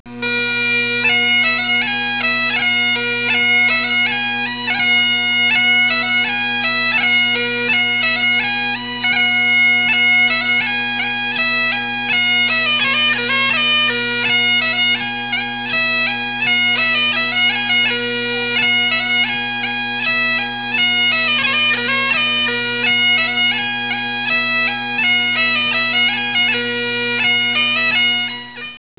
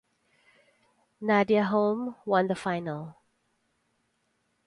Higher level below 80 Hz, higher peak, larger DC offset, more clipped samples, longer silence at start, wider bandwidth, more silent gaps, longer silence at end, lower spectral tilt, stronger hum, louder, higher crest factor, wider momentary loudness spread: first, -58 dBFS vs -72 dBFS; first, -4 dBFS vs -10 dBFS; first, 0.4% vs under 0.1%; neither; second, 0.05 s vs 1.2 s; second, 4 kHz vs 11 kHz; neither; second, 0.2 s vs 1.55 s; second, 1 dB/octave vs -7 dB/octave; neither; first, -14 LUFS vs -27 LUFS; second, 12 dB vs 20 dB; second, 6 LU vs 13 LU